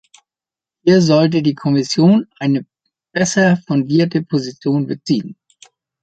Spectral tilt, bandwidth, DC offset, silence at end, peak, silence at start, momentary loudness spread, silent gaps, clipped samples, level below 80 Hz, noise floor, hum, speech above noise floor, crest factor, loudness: -6 dB/octave; 9 kHz; under 0.1%; 0.7 s; -2 dBFS; 0.85 s; 8 LU; none; under 0.1%; -58 dBFS; -90 dBFS; none; 75 dB; 14 dB; -16 LUFS